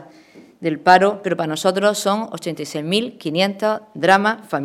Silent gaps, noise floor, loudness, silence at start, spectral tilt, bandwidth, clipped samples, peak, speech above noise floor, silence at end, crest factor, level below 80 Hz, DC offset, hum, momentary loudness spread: none; -46 dBFS; -18 LUFS; 0 s; -4.5 dB/octave; 16 kHz; under 0.1%; 0 dBFS; 28 dB; 0 s; 18 dB; -66 dBFS; under 0.1%; none; 12 LU